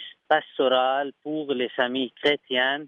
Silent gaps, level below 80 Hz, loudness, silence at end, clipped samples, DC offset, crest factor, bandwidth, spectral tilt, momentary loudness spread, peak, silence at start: none; -76 dBFS; -24 LUFS; 0 s; under 0.1%; under 0.1%; 18 dB; 8.4 kHz; -5 dB/octave; 7 LU; -8 dBFS; 0 s